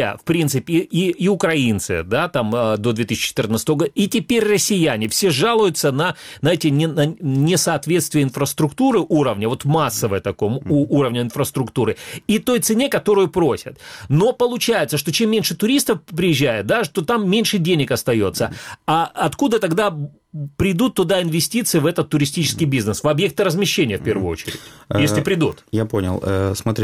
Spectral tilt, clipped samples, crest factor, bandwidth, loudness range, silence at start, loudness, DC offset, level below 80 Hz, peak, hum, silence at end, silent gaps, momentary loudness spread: -5 dB/octave; under 0.1%; 14 dB; 16.5 kHz; 2 LU; 0 s; -18 LUFS; under 0.1%; -48 dBFS; -4 dBFS; none; 0 s; none; 5 LU